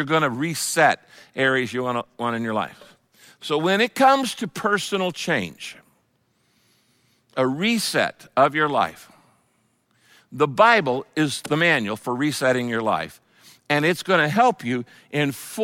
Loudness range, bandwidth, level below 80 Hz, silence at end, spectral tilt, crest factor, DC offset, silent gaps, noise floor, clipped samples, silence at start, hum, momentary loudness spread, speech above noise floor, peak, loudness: 5 LU; 17 kHz; -68 dBFS; 0 s; -4 dB/octave; 20 dB; under 0.1%; none; -67 dBFS; under 0.1%; 0 s; none; 11 LU; 45 dB; -2 dBFS; -21 LUFS